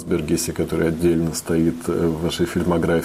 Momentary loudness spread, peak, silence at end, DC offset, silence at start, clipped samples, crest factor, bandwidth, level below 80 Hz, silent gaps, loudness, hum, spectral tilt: 3 LU; -8 dBFS; 0 s; under 0.1%; 0 s; under 0.1%; 12 dB; 16 kHz; -40 dBFS; none; -21 LUFS; none; -5.5 dB/octave